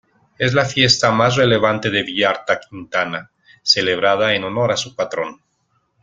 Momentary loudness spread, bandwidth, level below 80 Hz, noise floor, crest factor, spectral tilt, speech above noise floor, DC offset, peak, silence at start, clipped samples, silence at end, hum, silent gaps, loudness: 10 LU; 9.4 kHz; -54 dBFS; -66 dBFS; 18 dB; -4 dB/octave; 48 dB; under 0.1%; 0 dBFS; 0.4 s; under 0.1%; 0.7 s; none; none; -17 LUFS